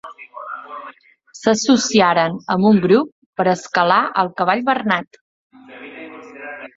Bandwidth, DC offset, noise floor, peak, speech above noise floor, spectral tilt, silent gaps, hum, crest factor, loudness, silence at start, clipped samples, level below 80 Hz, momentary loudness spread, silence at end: 7.8 kHz; under 0.1%; -37 dBFS; 0 dBFS; 21 dB; -4.5 dB/octave; 3.12-3.33 s, 5.21-5.50 s; none; 18 dB; -16 LUFS; 0.05 s; under 0.1%; -62 dBFS; 21 LU; 0.1 s